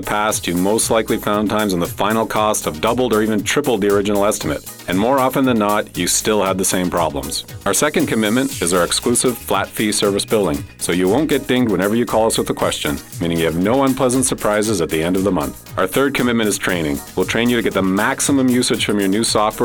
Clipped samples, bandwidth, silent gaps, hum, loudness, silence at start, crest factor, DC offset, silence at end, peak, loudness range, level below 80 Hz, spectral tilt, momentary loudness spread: under 0.1%; 20 kHz; none; none; -17 LUFS; 0 s; 16 dB; under 0.1%; 0 s; -2 dBFS; 1 LU; -42 dBFS; -4 dB/octave; 5 LU